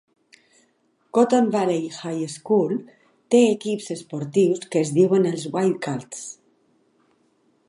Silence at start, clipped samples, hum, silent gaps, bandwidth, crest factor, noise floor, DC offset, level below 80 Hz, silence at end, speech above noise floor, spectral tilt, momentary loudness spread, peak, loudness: 1.15 s; under 0.1%; none; none; 11.5 kHz; 18 dB; -65 dBFS; under 0.1%; -74 dBFS; 1.35 s; 44 dB; -6 dB/octave; 12 LU; -4 dBFS; -22 LUFS